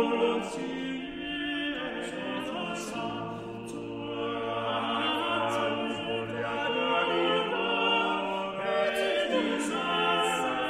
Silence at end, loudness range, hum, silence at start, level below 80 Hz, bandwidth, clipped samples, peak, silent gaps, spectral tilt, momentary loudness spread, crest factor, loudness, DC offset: 0 s; 7 LU; none; 0 s; -62 dBFS; 15.5 kHz; under 0.1%; -14 dBFS; none; -4 dB/octave; 9 LU; 16 dB; -30 LUFS; under 0.1%